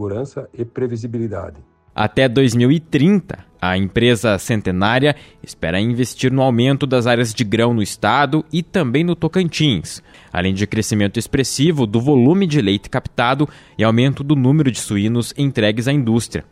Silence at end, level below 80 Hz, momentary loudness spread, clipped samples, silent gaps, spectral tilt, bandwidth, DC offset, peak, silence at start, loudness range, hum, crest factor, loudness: 0.1 s; -44 dBFS; 10 LU; under 0.1%; none; -6 dB/octave; 15.5 kHz; under 0.1%; -2 dBFS; 0 s; 2 LU; none; 14 dB; -17 LUFS